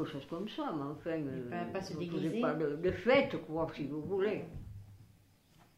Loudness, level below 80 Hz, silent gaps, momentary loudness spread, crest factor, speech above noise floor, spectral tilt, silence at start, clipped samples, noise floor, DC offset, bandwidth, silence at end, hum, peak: -36 LUFS; -62 dBFS; none; 12 LU; 20 dB; 29 dB; -7 dB/octave; 0 s; under 0.1%; -65 dBFS; under 0.1%; 15.5 kHz; 0.75 s; none; -16 dBFS